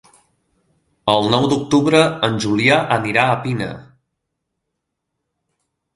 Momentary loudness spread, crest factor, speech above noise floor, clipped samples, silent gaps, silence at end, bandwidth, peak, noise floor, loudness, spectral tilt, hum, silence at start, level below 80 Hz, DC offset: 10 LU; 20 dB; 61 dB; under 0.1%; none; 2.15 s; 11.5 kHz; 0 dBFS; -77 dBFS; -16 LUFS; -5 dB/octave; none; 1.05 s; -54 dBFS; under 0.1%